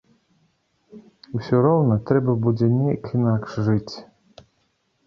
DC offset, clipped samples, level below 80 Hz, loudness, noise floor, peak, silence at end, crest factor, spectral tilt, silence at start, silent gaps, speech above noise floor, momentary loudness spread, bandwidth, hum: under 0.1%; under 0.1%; -54 dBFS; -21 LUFS; -68 dBFS; -4 dBFS; 1.05 s; 18 dB; -9.5 dB/octave; 0.95 s; none; 48 dB; 13 LU; 6.8 kHz; none